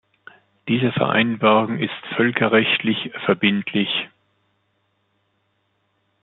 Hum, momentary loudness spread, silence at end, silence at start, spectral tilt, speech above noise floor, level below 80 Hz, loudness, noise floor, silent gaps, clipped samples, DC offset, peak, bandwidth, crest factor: none; 8 LU; 2.15 s; 0.65 s; -10 dB/octave; 49 dB; -64 dBFS; -19 LUFS; -68 dBFS; none; under 0.1%; under 0.1%; -2 dBFS; 4.2 kHz; 20 dB